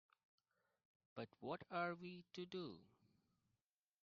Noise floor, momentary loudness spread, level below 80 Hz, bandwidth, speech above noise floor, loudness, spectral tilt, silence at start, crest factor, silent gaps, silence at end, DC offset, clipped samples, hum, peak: under -90 dBFS; 11 LU; -90 dBFS; 6.2 kHz; over 40 dB; -51 LUFS; -4 dB/octave; 1.15 s; 22 dB; none; 1.15 s; under 0.1%; under 0.1%; none; -32 dBFS